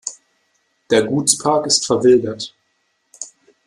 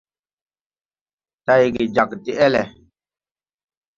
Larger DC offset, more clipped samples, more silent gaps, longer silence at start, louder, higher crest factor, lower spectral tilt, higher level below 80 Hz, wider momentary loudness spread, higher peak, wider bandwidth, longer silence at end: neither; neither; neither; second, 0.05 s vs 1.5 s; first, -15 LUFS vs -18 LUFS; about the same, 20 dB vs 20 dB; second, -3 dB/octave vs -6 dB/octave; about the same, -58 dBFS vs -56 dBFS; first, 20 LU vs 10 LU; about the same, 0 dBFS vs -2 dBFS; first, 13 kHz vs 7.4 kHz; second, 0.4 s vs 1.25 s